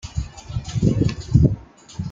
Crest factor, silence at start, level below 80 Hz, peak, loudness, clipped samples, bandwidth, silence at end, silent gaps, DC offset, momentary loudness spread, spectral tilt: 18 dB; 0.05 s; -32 dBFS; -2 dBFS; -21 LUFS; under 0.1%; 7.6 kHz; 0 s; none; under 0.1%; 15 LU; -7.5 dB/octave